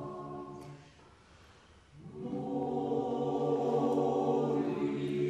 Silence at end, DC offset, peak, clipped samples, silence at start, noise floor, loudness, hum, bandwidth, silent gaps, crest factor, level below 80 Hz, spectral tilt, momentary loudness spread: 0 s; under 0.1%; -18 dBFS; under 0.1%; 0 s; -59 dBFS; -33 LUFS; none; 10.5 kHz; none; 16 dB; -68 dBFS; -8 dB/octave; 19 LU